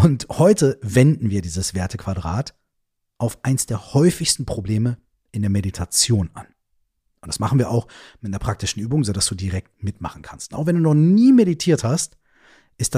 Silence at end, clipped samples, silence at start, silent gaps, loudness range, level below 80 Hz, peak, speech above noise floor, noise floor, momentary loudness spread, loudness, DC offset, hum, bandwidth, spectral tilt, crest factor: 0 s; under 0.1%; 0 s; none; 5 LU; -44 dBFS; -2 dBFS; 55 dB; -74 dBFS; 15 LU; -20 LUFS; under 0.1%; none; 15.5 kHz; -5.5 dB/octave; 18 dB